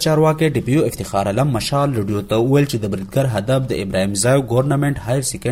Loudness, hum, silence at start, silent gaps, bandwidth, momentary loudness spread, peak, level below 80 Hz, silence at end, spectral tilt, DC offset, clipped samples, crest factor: -18 LUFS; none; 0 s; none; 16 kHz; 5 LU; -4 dBFS; -42 dBFS; 0 s; -5.5 dB/octave; under 0.1%; under 0.1%; 14 dB